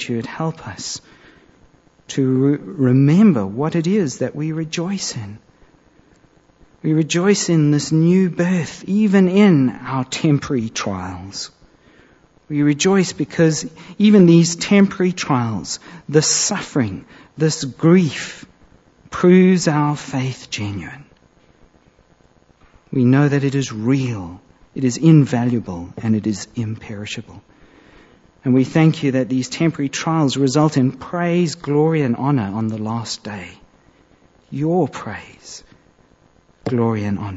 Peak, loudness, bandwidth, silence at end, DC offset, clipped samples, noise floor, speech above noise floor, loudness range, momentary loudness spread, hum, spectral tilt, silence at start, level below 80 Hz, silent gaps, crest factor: -2 dBFS; -17 LUFS; 8 kHz; 0 s; under 0.1%; under 0.1%; -54 dBFS; 37 dB; 8 LU; 16 LU; none; -6 dB/octave; 0 s; -54 dBFS; none; 18 dB